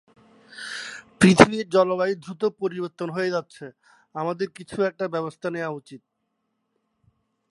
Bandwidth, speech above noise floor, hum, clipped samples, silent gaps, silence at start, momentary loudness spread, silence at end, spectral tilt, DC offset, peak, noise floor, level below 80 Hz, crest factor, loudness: 11.5 kHz; 54 dB; none; under 0.1%; none; 0.55 s; 22 LU; 1.55 s; -5.5 dB/octave; under 0.1%; 0 dBFS; -76 dBFS; -56 dBFS; 24 dB; -23 LUFS